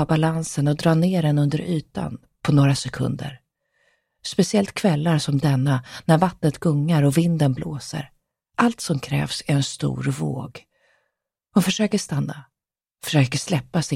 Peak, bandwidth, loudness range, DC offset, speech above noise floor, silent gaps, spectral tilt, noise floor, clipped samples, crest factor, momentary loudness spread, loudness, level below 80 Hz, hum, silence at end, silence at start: -4 dBFS; 15.5 kHz; 5 LU; under 0.1%; 57 dB; none; -6 dB/octave; -78 dBFS; under 0.1%; 18 dB; 12 LU; -22 LUFS; -54 dBFS; none; 0 s; 0 s